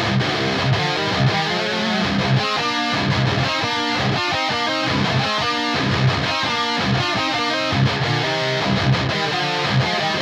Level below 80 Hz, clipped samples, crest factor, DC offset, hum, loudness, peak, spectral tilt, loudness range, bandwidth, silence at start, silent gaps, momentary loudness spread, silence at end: -44 dBFS; under 0.1%; 14 dB; under 0.1%; none; -19 LUFS; -6 dBFS; -5 dB/octave; 0 LU; 12.5 kHz; 0 s; none; 1 LU; 0 s